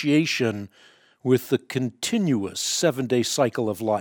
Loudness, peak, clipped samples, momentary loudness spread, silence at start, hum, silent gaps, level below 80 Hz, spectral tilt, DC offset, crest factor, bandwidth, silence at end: -24 LUFS; -6 dBFS; under 0.1%; 7 LU; 0 s; none; none; -68 dBFS; -4.5 dB/octave; under 0.1%; 18 dB; 19 kHz; 0 s